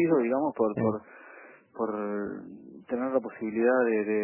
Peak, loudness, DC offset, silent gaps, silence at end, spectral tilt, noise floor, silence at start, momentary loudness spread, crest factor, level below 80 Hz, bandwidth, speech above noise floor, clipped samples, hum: -12 dBFS; -29 LUFS; under 0.1%; none; 0 s; -12 dB/octave; -51 dBFS; 0 s; 23 LU; 16 dB; -68 dBFS; 3.1 kHz; 24 dB; under 0.1%; none